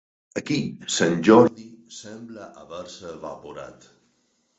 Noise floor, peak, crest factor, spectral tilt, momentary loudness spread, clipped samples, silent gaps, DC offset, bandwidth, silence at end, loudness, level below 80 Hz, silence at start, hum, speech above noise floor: -68 dBFS; -2 dBFS; 22 dB; -5 dB/octave; 25 LU; under 0.1%; none; under 0.1%; 8.2 kHz; 0.9 s; -20 LUFS; -62 dBFS; 0.35 s; none; 45 dB